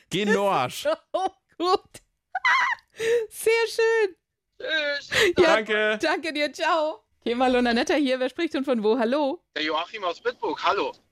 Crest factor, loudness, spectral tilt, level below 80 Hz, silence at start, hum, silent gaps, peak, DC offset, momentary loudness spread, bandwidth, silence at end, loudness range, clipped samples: 18 dB; -24 LUFS; -3.5 dB/octave; -60 dBFS; 0.1 s; none; none; -6 dBFS; under 0.1%; 8 LU; 16 kHz; 0.2 s; 2 LU; under 0.1%